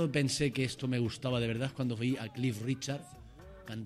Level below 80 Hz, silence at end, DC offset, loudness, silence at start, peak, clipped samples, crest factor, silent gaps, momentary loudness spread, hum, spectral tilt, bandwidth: -60 dBFS; 0 s; under 0.1%; -34 LUFS; 0 s; -18 dBFS; under 0.1%; 16 dB; none; 18 LU; none; -5.5 dB/octave; 14 kHz